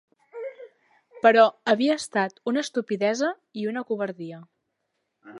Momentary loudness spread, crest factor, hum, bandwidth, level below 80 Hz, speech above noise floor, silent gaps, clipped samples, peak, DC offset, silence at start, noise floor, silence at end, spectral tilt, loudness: 19 LU; 24 dB; none; 11.5 kHz; -80 dBFS; 54 dB; none; under 0.1%; -2 dBFS; under 0.1%; 0.35 s; -78 dBFS; 0 s; -4.5 dB/octave; -24 LUFS